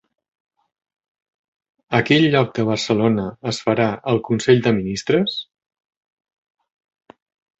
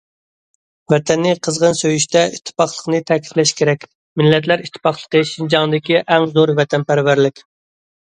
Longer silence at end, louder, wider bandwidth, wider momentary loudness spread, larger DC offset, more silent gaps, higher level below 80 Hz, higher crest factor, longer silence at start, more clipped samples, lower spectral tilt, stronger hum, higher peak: first, 2.15 s vs 0.7 s; second, -19 LUFS vs -16 LUFS; second, 8.2 kHz vs 10.5 kHz; first, 8 LU vs 5 LU; neither; second, none vs 3.95-4.16 s; about the same, -54 dBFS vs -58 dBFS; about the same, 20 dB vs 16 dB; first, 1.9 s vs 0.9 s; neither; first, -6 dB/octave vs -4.5 dB/octave; neither; about the same, -2 dBFS vs 0 dBFS